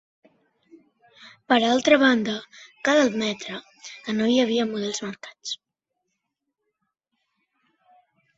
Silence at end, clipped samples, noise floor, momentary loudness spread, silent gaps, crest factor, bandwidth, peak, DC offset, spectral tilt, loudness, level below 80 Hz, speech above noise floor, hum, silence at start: 2.85 s; under 0.1%; -80 dBFS; 18 LU; none; 22 dB; 7.8 kHz; -4 dBFS; under 0.1%; -3.5 dB/octave; -22 LUFS; -68 dBFS; 58 dB; none; 1.2 s